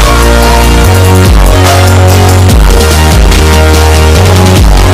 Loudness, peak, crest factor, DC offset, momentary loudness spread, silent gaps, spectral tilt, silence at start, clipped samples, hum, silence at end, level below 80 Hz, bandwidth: -4 LUFS; 0 dBFS; 2 dB; under 0.1%; 1 LU; none; -5 dB/octave; 0 s; 4%; none; 0 s; -6 dBFS; 16 kHz